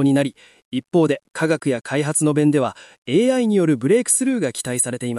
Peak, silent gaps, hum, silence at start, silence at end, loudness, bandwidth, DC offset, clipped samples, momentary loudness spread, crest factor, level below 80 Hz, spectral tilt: -6 dBFS; 0.65-0.72 s, 2.98-3.02 s; none; 0 s; 0 s; -19 LUFS; 13.5 kHz; under 0.1%; under 0.1%; 7 LU; 14 dB; -68 dBFS; -5 dB/octave